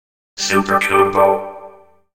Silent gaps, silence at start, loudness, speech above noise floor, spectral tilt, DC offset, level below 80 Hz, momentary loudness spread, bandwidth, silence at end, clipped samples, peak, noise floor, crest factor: none; 0.35 s; -15 LUFS; 28 dB; -3.5 dB/octave; under 0.1%; -52 dBFS; 10 LU; 16.5 kHz; 0.45 s; under 0.1%; 0 dBFS; -42 dBFS; 16 dB